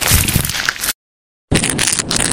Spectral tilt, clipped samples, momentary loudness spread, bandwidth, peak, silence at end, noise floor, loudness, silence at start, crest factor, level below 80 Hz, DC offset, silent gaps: -2.5 dB/octave; 0.1%; 8 LU; over 20 kHz; 0 dBFS; 0 s; under -90 dBFS; -15 LUFS; 0 s; 16 dB; -28 dBFS; under 0.1%; 0.95-1.48 s